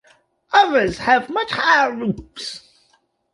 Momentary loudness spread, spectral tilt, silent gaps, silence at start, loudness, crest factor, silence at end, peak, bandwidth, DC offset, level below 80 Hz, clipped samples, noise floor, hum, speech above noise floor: 15 LU; -4 dB/octave; none; 0.5 s; -17 LUFS; 18 dB; 0.75 s; -2 dBFS; 11.5 kHz; under 0.1%; -50 dBFS; under 0.1%; -62 dBFS; none; 43 dB